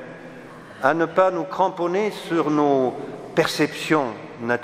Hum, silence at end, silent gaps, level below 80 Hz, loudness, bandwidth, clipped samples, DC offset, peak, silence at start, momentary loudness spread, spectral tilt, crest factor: none; 0 s; none; -66 dBFS; -22 LUFS; 16 kHz; under 0.1%; under 0.1%; -2 dBFS; 0 s; 18 LU; -5.5 dB/octave; 20 dB